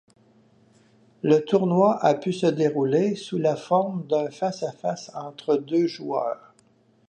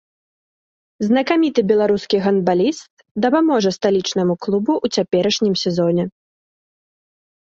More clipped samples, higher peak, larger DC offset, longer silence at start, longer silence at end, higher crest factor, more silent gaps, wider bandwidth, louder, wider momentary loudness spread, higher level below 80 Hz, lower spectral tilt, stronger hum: neither; second, -6 dBFS vs -2 dBFS; neither; first, 1.25 s vs 1 s; second, 0.75 s vs 1.4 s; about the same, 18 dB vs 16 dB; second, none vs 2.90-2.97 s, 3.11-3.15 s; first, 9.2 kHz vs 7.8 kHz; second, -24 LUFS vs -18 LUFS; first, 10 LU vs 5 LU; second, -74 dBFS vs -60 dBFS; first, -7 dB/octave vs -5.5 dB/octave; neither